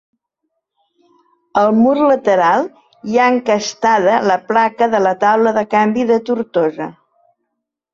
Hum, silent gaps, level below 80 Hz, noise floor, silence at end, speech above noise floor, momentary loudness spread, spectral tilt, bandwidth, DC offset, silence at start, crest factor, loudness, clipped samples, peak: none; none; -60 dBFS; -76 dBFS; 1 s; 62 dB; 7 LU; -5 dB/octave; 7.6 kHz; under 0.1%; 1.55 s; 14 dB; -14 LUFS; under 0.1%; -2 dBFS